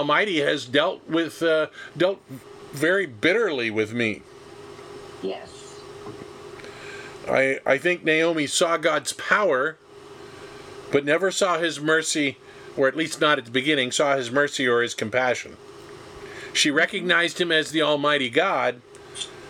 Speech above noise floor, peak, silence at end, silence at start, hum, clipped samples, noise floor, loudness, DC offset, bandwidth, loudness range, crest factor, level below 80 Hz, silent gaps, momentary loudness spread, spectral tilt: 21 dB; -4 dBFS; 0 s; 0 s; none; under 0.1%; -43 dBFS; -22 LUFS; under 0.1%; 17 kHz; 5 LU; 20 dB; -64 dBFS; none; 20 LU; -3 dB/octave